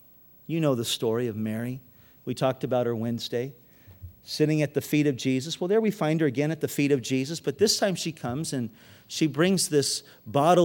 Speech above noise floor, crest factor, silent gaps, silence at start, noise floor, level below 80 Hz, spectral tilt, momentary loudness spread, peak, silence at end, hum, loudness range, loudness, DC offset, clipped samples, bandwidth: 21 dB; 20 dB; none; 0.5 s; -47 dBFS; -66 dBFS; -5 dB/octave; 11 LU; -8 dBFS; 0 s; none; 4 LU; -26 LUFS; under 0.1%; under 0.1%; 19 kHz